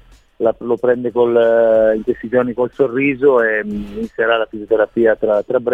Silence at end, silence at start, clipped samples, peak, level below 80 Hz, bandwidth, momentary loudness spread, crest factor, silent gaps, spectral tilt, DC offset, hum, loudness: 0 s; 0.4 s; under 0.1%; -2 dBFS; -48 dBFS; 4.2 kHz; 7 LU; 14 dB; none; -7.5 dB/octave; 0.1%; none; -16 LUFS